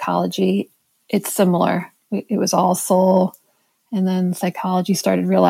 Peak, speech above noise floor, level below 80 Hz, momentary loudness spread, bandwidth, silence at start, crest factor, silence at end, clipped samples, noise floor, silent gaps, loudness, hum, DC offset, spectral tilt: -2 dBFS; 46 dB; -72 dBFS; 8 LU; 16.5 kHz; 0 s; 16 dB; 0 s; under 0.1%; -64 dBFS; none; -19 LUFS; none; under 0.1%; -5.5 dB/octave